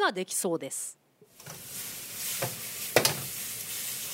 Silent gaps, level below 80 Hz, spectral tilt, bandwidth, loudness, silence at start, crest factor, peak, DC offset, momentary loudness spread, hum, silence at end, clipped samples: none; -70 dBFS; -2 dB/octave; 16 kHz; -31 LUFS; 0 s; 26 dB; -6 dBFS; under 0.1%; 15 LU; none; 0 s; under 0.1%